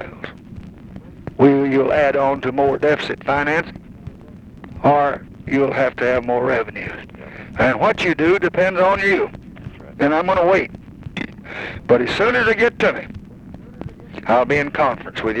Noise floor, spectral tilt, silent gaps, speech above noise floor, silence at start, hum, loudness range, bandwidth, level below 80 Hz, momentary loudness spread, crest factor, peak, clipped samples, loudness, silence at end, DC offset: -39 dBFS; -6.5 dB/octave; none; 22 dB; 0 s; none; 2 LU; 9.4 kHz; -44 dBFS; 21 LU; 18 dB; 0 dBFS; under 0.1%; -17 LUFS; 0 s; under 0.1%